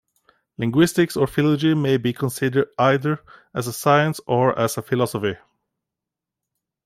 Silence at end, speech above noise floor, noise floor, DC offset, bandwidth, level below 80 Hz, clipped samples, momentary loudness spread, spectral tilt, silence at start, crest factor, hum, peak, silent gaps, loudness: 1.5 s; 66 dB; -86 dBFS; under 0.1%; 16 kHz; -58 dBFS; under 0.1%; 10 LU; -6 dB/octave; 0.6 s; 18 dB; none; -4 dBFS; none; -21 LUFS